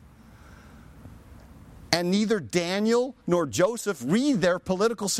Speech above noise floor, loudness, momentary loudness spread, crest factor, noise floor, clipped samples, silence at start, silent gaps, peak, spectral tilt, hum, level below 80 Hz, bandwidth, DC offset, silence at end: 26 dB; -25 LUFS; 3 LU; 22 dB; -50 dBFS; under 0.1%; 0.5 s; none; -4 dBFS; -4.5 dB/octave; none; -56 dBFS; 16 kHz; under 0.1%; 0 s